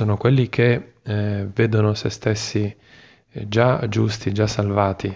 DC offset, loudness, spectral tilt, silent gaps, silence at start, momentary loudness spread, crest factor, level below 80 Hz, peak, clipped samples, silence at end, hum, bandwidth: under 0.1%; -21 LUFS; -6.5 dB/octave; none; 0 s; 7 LU; 18 dB; -44 dBFS; -2 dBFS; under 0.1%; 0 s; none; 7.8 kHz